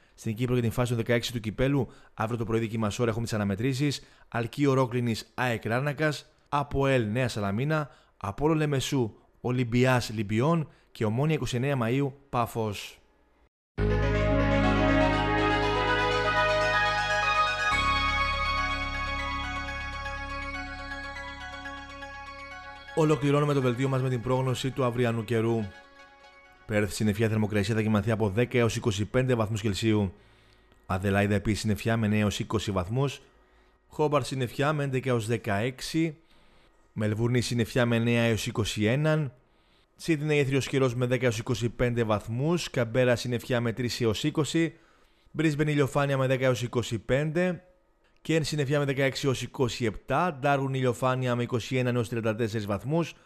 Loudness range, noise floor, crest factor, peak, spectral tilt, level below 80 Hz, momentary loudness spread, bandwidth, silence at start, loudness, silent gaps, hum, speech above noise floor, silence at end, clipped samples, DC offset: 4 LU; -64 dBFS; 16 dB; -10 dBFS; -6 dB/octave; -44 dBFS; 10 LU; 14.5 kHz; 0.2 s; -27 LUFS; 13.48-13.75 s; none; 38 dB; 0.15 s; under 0.1%; under 0.1%